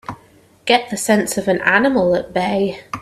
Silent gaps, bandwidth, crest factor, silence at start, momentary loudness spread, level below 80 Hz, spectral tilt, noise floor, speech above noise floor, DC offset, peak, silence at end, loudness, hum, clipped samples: none; 14.5 kHz; 18 dB; 0.1 s; 8 LU; -50 dBFS; -4 dB/octave; -50 dBFS; 33 dB; under 0.1%; 0 dBFS; 0 s; -17 LUFS; none; under 0.1%